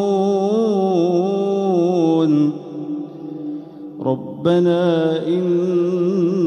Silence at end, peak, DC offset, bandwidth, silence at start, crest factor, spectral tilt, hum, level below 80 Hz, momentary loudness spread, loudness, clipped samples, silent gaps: 0 s; -4 dBFS; under 0.1%; 6.8 kHz; 0 s; 12 dB; -8 dB/octave; none; -66 dBFS; 13 LU; -18 LUFS; under 0.1%; none